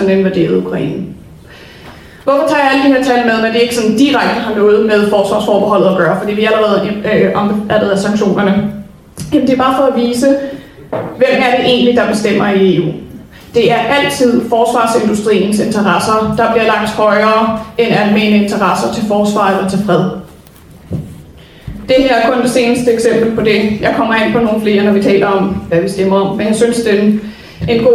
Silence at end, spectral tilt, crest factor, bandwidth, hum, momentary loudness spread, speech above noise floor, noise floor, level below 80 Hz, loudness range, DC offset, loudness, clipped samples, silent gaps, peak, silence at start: 0 s; -5.5 dB/octave; 12 dB; 15 kHz; none; 9 LU; 27 dB; -37 dBFS; -40 dBFS; 3 LU; under 0.1%; -11 LUFS; under 0.1%; none; 0 dBFS; 0 s